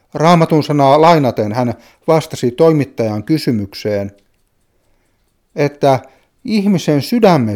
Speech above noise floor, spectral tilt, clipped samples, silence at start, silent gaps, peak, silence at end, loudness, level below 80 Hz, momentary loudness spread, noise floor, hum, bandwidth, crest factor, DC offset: 47 dB; -7 dB/octave; under 0.1%; 0.15 s; none; 0 dBFS; 0 s; -14 LUFS; -54 dBFS; 10 LU; -60 dBFS; none; 17 kHz; 14 dB; under 0.1%